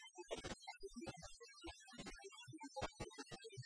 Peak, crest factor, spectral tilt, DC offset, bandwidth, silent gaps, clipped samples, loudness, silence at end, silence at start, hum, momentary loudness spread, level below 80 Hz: -32 dBFS; 22 dB; -3.5 dB/octave; under 0.1%; 10.5 kHz; none; under 0.1%; -53 LUFS; 0 s; 0 s; none; 7 LU; -66 dBFS